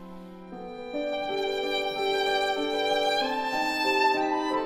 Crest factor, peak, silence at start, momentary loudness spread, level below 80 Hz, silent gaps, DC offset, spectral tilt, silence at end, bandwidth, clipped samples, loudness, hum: 16 dB; -12 dBFS; 0 s; 17 LU; -60 dBFS; none; under 0.1%; -3 dB/octave; 0 s; 16 kHz; under 0.1%; -26 LUFS; none